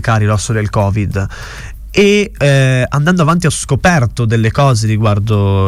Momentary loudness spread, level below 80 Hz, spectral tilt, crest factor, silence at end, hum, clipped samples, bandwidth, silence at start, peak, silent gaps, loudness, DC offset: 8 LU; -30 dBFS; -6 dB/octave; 10 dB; 0 s; none; under 0.1%; 14 kHz; 0 s; -2 dBFS; none; -12 LUFS; under 0.1%